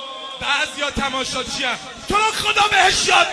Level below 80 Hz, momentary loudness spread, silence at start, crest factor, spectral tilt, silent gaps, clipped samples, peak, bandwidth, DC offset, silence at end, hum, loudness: -42 dBFS; 10 LU; 0 s; 18 dB; -1 dB/octave; none; under 0.1%; -2 dBFS; 11 kHz; under 0.1%; 0 s; none; -18 LUFS